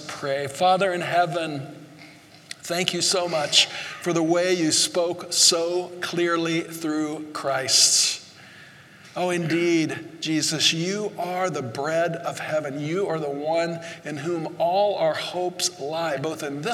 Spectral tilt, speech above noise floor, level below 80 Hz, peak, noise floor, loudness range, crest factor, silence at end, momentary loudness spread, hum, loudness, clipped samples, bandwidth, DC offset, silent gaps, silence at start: -2.5 dB/octave; 24 dB; -76 dBFS; -2 dBFS; -48 dBFS; 5 LU; 22 dB; 0 s; 12 LU; none; -23 LUFS; under 0.1%; 16 kHz; under 0.1%; none; 0 s